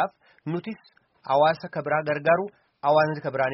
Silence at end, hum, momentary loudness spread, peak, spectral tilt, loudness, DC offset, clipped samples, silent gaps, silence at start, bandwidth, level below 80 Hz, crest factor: 0 s; none; 17 LU; -8 dBFS; -4 dB/octave; -24 LUFS; under 0.1%; under 0.1%; none; 0 s; 5.8 kHz; -68 dBFS; 18 dB